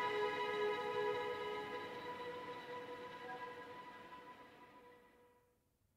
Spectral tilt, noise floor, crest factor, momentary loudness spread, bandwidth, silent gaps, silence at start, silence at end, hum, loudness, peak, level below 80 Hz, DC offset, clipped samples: -4 dB/octave; -79 dBFS; 18 dB; 20 LU; 16 kHz; none; 0 s; 0.7 s; none; -44 LUFS; -28 dBFS; -80 dBFS; under 0.1%; under 0.1%